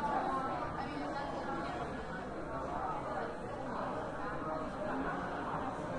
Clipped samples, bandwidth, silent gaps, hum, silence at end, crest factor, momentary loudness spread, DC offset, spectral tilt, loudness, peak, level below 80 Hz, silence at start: under 0.1%; 11.5 kHz; none; none; 0 s; 16 dB; 5 LU; under 0.1%; -6.5 dB/octave; -39 LUFS; -22 dBFS; -54 dBFS; 0 s